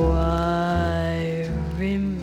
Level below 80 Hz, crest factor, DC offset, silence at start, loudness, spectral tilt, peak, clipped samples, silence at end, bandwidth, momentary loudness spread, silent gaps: -30 dBFS; 12 dB; under 0.1%; 0 s; -24 LUFS; -8 dB/octave; -10 dBFS; under 0.1%; 0 s; 11 kHz; 5 LU; none